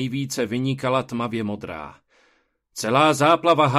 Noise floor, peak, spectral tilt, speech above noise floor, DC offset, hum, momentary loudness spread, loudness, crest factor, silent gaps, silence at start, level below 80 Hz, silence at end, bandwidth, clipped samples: -65 dBFS; -4 dBFS; -5 dB/octave; 44 dB; under 0.1%; none; 18 LU; -21 LUFS; 18 dB; none; 0 s; -60 dBFS; 0 s; 14.5 kHz; under 0.1%